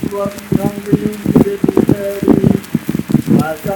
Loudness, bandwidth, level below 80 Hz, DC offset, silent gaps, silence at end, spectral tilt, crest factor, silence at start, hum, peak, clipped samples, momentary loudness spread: -14 LUFS; 19.5 kHz; -38 dBFS; under 0.1%; none; 0 s; -7.5 dB/octave; 14 dB; 0 s; none; 0 dBFS; 0.5%; 6 LU